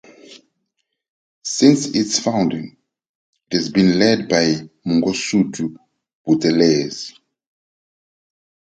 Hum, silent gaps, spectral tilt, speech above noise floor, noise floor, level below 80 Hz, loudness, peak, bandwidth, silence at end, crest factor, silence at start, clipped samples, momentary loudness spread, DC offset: none; 1.09-1.42 s, 3.09-3.33 s, 6.15-6.25 s; -4.5 dB/octave; 58 dB; -74 dBFS; -58 dBFS; -17 LUFS; 0 dBFS; 9.4 kHz; 1.65 s; 20 dB; 0.3 s; under 0.1%; 15 LU; under 0.1%